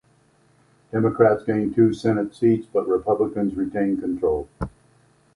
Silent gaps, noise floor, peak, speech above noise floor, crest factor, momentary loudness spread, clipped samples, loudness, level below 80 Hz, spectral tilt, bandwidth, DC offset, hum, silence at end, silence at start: none; -59 dBFS; -4 dBFS; 38 dB; 18 dB; 9 LU; under 0.1%; -22 LUFS; -48 dBFS; -9 dB/octave; 11 kHz; under 0.1%; none; 0.65 s; 0.95 s